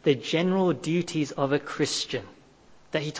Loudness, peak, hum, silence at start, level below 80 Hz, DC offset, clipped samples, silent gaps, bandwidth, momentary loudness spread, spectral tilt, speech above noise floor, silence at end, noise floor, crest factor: -27 LUFS; -10 dBFS; none; 0.05 s; -64 dBFS; under 0.1%; under 0.1%; none; 8 kHz; 8 LU; -5 dB/octave; 28 dB; 0 s; -54 dBFS; 18 dB